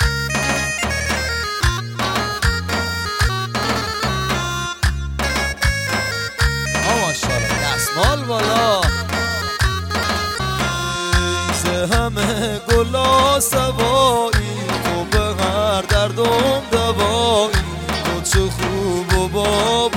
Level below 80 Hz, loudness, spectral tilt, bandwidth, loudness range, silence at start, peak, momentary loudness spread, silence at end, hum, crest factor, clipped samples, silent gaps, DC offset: -28 dBFS; -18 LUFS; -4 dB/octave; 17 kHz; 3 LU; 0 s; -4 dBFS; 5 LU; 0 s; none; 14 dB; under 0.1%; none; under 0.1%